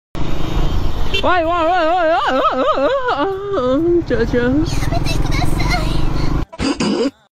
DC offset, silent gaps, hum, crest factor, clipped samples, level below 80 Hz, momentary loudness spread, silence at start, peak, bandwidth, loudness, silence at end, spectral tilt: under 0.1%; none; none; 10 dB; under 0.1%; -22 dBFS; 7 LU; 0.15 s; -4 dBFS; 14 kHz; -17 LUFS; 0.2 s; -6 dB/octave